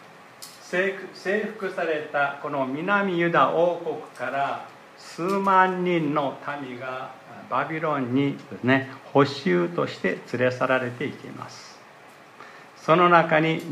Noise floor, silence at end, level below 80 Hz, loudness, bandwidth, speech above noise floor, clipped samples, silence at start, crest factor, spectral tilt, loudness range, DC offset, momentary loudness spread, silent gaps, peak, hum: -48 dBFS; 0 s; -76 dBFS; -24 LUFS; 15 kHz; 25 dB; under 0.1%; 0 s; 22 dB; -6.5 dB/octave; 3 LU; under 0.1%; 20 LU; none; -4 dBFS; none